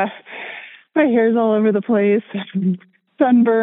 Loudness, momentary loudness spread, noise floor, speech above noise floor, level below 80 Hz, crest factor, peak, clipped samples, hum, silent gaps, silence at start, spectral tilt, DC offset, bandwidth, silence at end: -17 LUFS; 16 LU; -36 dBFS; 21 dB; -78 dBFS; 14 dB; -4 dBFS; under 0.1%; none; none; 0 s; -11.5 dB/octave; under 0.1%; 3.9 kHz; 0 s